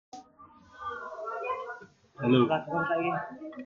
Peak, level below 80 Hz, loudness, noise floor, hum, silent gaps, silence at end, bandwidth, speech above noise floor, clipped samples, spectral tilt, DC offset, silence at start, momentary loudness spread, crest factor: -12 dBFS; -70 dBFS; -30 LUFS; -56 dBFS; none; none; 0 s; 7.2 kHz; 28 dB; under 0.1%; -7.5 dB/octave; under 0.1%; 0.15 s; 18 LU; 20 dB